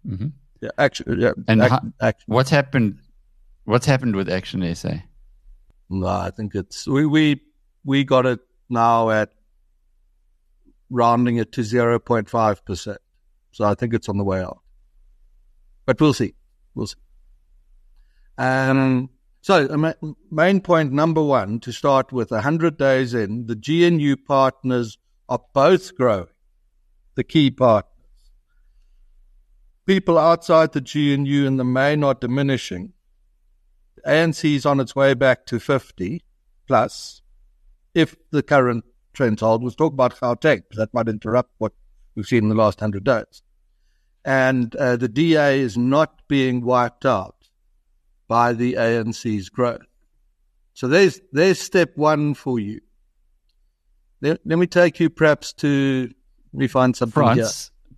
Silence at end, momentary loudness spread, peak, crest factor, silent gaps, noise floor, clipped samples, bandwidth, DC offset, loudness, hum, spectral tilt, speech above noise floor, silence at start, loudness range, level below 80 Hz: 0.3 s; 13 LU; -2 dBFS; 20 dB; none; -63 dBFS; under 0.1%; 13 kHz; under 0.1%; -20 LUFS; none; -6.5 dB/octave; 45 dB; 0.05 s; 5 LU; -52 dBFS